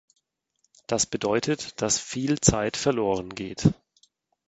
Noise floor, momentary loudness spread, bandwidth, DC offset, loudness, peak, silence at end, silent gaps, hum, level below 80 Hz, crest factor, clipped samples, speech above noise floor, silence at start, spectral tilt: -73 dBFS; 8 LU; 9 kHz; under 0.1%; -25 LUFS; -2 dBFS; 0.75 s; none; none; -48 dBFS; 26 dB; under 0.1%; 48 dB; 0.9 s; -4 dB/octave